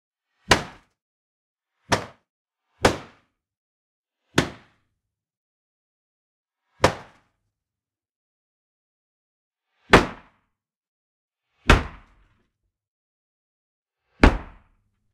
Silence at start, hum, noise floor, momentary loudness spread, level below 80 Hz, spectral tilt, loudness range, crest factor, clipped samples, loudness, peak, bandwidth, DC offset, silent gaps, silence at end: 0.5 s; none; under -90 dBFS; 18 LU; -34 dBFS; -4.5 dB/octave; 8 LU; 28 dB; under 0.1%; -22 LUFS; 0 dBFS; 16 kHz; under 0.1%; 1.02-1.56 s, 2.30-2.45 s, 3.57-4.04 s, 5.37-6.44 s, 8.11-9.51 s, 10.76-10.81 s, 10.87-11.28 s, 12.88-13.82 s; 0.7 s